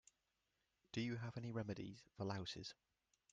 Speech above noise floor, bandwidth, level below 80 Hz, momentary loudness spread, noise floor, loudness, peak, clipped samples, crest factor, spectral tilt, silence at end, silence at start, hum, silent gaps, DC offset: 40 dB; 9.2 kHz; -78 dBFS; 9 LU; -88 dBFS; -49 LUFS; -30 dBFS; under 0.1%; 20 dB; -6 dB/octave; 0.6 s; 0.95 s; none; none; under 0.1%